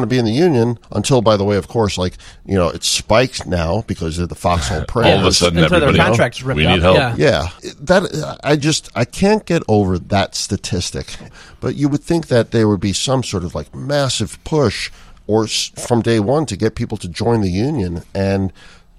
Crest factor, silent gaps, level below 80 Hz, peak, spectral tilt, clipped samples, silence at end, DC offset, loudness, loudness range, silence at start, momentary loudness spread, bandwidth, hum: 16 dB; none; -34 dBFS; 0 dBFS; -5 dB/octave; under 0.1%; 0.5 s; under 0.1%; -16 LUFS; 5 LU; 0 s; 11 LU; 14.5 kHz; none